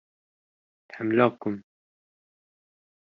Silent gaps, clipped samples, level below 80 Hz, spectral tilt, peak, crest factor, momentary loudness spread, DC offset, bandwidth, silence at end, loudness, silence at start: none; under 0.1%; -74 dBFS; -5.5 dB/octave; -6 dBFS; 26 dB; 17 LU; under 0.1%; 5.8 kHz; 1.55 s; -26 LUFS; 0.95 s